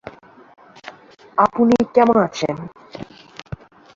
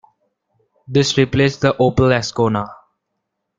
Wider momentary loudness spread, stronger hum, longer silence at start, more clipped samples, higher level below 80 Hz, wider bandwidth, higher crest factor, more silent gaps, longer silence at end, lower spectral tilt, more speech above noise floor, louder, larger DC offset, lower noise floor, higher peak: first, 25 LU vs 5 LU; neither; second, 0.05 s vs 0.9 s; neither; second, -54 dBFS vs -46 dBFS; second, 7.4 kHz vs 8.8 kHz; about the same, 18 dB vs 18 dB; neither; second, 0.4 s vs 0.85 s; about the same, -6.5 dB/octave vs -5.5 dB/octave; second, 26 dB vs 60 dB; about the same, -17 LUFS vs -16 LUFS; neither; second, -41 dBFS vs -75 dBFS; about the same, -2 dBFS vs 0 dBFS